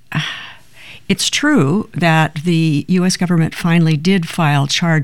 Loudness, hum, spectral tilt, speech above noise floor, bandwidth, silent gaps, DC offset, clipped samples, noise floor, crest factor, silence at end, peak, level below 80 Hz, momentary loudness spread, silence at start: -15 LUFS; none; -5 dB/octave; 26 dB; 13 kHz; none; 1%; under 0.1%; -40 dBFS; 14 dB; 0 s; -2 dBFS; -48 dBFS; 8 LU; 0.1 s